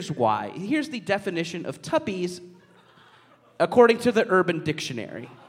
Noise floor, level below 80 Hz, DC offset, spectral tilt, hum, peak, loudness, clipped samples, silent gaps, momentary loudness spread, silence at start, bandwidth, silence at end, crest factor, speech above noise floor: -56 dBFS; -68 dBFS; under 0.1%; -5.5 dB/octave; none; -4 dBFS; -24 LUFS; under 0.1%; none; 14 LU; 0 s; 14.5 kHz; 0.15 s; 22 dB; 32 dB